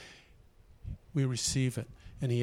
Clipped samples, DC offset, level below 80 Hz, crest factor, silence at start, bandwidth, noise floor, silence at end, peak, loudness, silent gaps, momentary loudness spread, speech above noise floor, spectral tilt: under 0.1%; under 0.1%; -52 dBFS; 16 dB; 0 s; 15 kHz; -59 dBFS; 0 s; -18 dBFS; -33 LUFS; none; 18 LU; 27 dB; -5 dB/octave